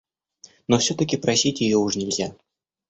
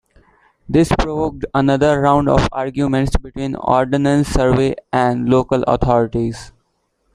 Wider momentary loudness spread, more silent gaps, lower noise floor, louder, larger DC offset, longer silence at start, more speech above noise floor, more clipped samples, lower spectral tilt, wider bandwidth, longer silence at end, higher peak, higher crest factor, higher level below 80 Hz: about the same, 7 LU vs 7 LU; neither; second, -53 dBFS vs -66 dBFS; second, -22 LUFS vs -16 LUFS; neither; about the same, 0.7 s vs 0.7 s; second, 31 dB vs 50 dB; neither; second, -4 dB/octave vs -7 dB/octave; second, 8.2 kHz vs 12.5 kHz; about the same, 0.55 s vs 0.65 s; second, -6 dBFS vs 0 dBFS; about the same, 18 dB vs 16 dB; second, -56 dBFS vs -30 dBFS